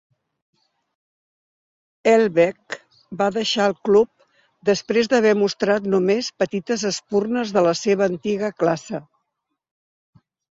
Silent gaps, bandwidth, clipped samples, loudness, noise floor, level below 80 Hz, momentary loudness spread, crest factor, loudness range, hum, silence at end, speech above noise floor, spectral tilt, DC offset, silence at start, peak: none; 7.8 kHz; under 0.1%; -20 LUFS; -78 dBFS; -64 dBFS; 9 LU; 16 dB; 4 LU; none; 1.5 s; 59 dB; -4.5 dB/octave; under 0.1%; 2.05 s; -4 dBFS